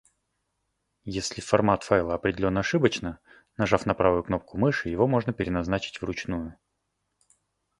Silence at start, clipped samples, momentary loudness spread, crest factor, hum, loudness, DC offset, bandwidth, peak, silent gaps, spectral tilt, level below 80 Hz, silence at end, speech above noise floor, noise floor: 1.05 s; under 0.1%; 12 LU; 24 dB; none; -26 LUFS; under 0.1%; 11.5 kHz; -4 dBFS; none; -6 dB/octave; -48 dBFS; 1.25 s; 53 dB; -78 dBFS